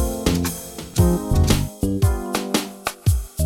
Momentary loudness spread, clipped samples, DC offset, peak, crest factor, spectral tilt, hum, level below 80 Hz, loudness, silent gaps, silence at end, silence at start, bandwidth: 7 LU; under 0.1%; under 0.1%; -4 dBFS; 18 dB; -5.5 dB/octave; none; -26 dBFS; -22 LUFS; none; 0 s; 0 s; 19.5 kHz